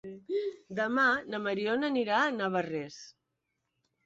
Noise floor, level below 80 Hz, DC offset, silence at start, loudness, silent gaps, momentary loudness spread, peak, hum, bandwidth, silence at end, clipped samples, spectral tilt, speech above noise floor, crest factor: -83 dBFS; -76 dBFS; under 0.1%; 0.05 s; -30 LUFS; none; 11 LU; -14 dBFS; none; 7.8 kHz; 0.95 s; under 0.1%; -5 dB/octave; 53 dB; 18 dB